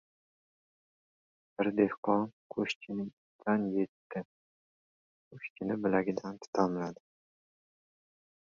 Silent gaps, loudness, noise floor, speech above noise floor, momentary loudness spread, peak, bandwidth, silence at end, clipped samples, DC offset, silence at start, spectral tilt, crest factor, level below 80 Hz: 1.98-2.03 s, 2.33-2.50 s, 2.75-2.81 s, 3.13-3.39 s, 3.88-4.10 s, 4.25-5.31 s, 5.50-5.56 s, 6.47-6.53 s; -34 LUFS; under -90 dBFS; over 57 dB; 13 LU; -14 dBFS; 7.4 kHz; 1.65 s; under 0.1%; under 0.1%; 1.6 s; -7 dB/octave; 22 dB; -74 dBFS